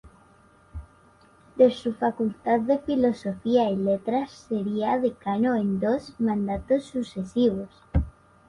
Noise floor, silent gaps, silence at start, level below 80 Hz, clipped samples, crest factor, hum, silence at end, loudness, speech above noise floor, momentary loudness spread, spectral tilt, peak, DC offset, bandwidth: -56 dBFS; none; 0.05 s; -42 dBFS; under 0.1%; 20 dB; none; 0.4 s; -25 LUFS; 32 dB; 10 LU; -8 dB/octave; -6 dBFS; under 0.1%; 11 kHz